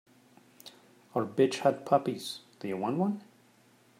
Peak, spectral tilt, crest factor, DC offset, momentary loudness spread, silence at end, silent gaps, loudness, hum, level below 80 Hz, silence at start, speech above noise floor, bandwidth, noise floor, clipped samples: -10 dBFS; -6 dB/octave; 22 dB; under 0.1%; 25 LU; 0.8 s; none; -31 LUFS; none; -80 dBFS; 0.65 s; 33 dB; 16 kHz; -63 dBFS; under 0.1%